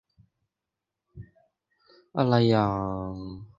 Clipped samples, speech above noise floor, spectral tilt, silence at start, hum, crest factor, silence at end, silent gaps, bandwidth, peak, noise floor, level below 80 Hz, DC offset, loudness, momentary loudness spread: under 0.1%; 62 dB; -8.5 dB/octave; 1.15 s; none; 22 dB; 0.1 s; none; 7.4 kHz; -6 dBFS; -87 dBFS; -54 dBFS; under 0.1%; -25 LUFS; 15 LU